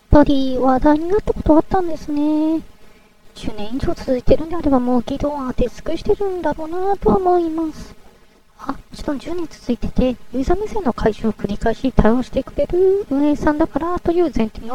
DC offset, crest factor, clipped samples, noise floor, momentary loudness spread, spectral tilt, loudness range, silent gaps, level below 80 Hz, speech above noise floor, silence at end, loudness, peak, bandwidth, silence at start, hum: under 0.1%; 18 dB; under 0.1%; -49 dBFS; 11 LU; -7.5 dB/octave; 4 LU; none; -28 dBFS; 31 dB; 0 s; -19 LUFS; 0 dBFS; 12.5 kHz; 0.1 s; none